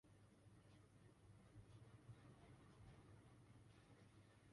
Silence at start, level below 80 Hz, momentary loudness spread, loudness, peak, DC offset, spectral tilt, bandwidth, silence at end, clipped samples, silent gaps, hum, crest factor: 0.05 s; -78 dBFS; 4 LU; -68 LUFS; -52 dBFS; under 0.1%; -6 dB/octave; 11 kHz; 0 s; under 0.1%; none; none; 16 dB